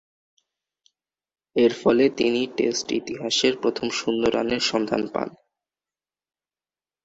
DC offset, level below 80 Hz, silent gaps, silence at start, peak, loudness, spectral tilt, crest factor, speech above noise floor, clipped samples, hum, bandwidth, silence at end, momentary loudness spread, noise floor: under 0.1%; -60 dBFS; none; 1.55 s; -6 dBFS; -23 LUFS; -3.5 dB/octave; 20 dB; over 68 dB; under 0.1%; none; 8 kHz; 1.75 s; 8 LU; under -90 dBFS